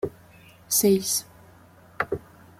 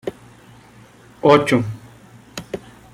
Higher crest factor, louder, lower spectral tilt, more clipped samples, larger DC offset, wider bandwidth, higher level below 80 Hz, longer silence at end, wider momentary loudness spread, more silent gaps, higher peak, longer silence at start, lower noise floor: about the same, 20 dB vs 20 dB; second, -24 LUFS vs -16 LUFS; second, -3.5 dB/octave vs -6 dB/octave; neither; neither; about the same, 16.5 kHz vs 15.5 kHz; second, -60 dBFS vs -54 dBFS; about the same, 0.4 s vs 0.35 s; second, 14 LU vs 21 LU; neither; second, -8 dBFS vs -2 dBFS; about the same, 0.05 s vs 0.05 s; first, -52 dBFS vs -46 dBFS